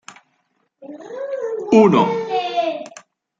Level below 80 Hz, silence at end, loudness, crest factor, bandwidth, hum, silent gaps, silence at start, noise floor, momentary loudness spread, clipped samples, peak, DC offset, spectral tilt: -68 dBFS; 0.4 s; -17 LUFS; 18 dB; 7.8 kHz; none; none; 0.1 s; -67 dBFS; 24 LU; under 0.1%; -2 dBFS; under 0.1%; -6.5 dB/octave